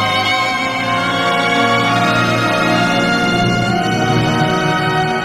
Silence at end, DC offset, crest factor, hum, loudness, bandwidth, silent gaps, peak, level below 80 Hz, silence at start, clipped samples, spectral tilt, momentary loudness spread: 0 s; under 0.1%; 14 dB; none; -14 LUFS; 16 kHz; none; -2 dBFS; -42 dBFS; 0 s; under 0.1%; -5 dB/octave; 3 LU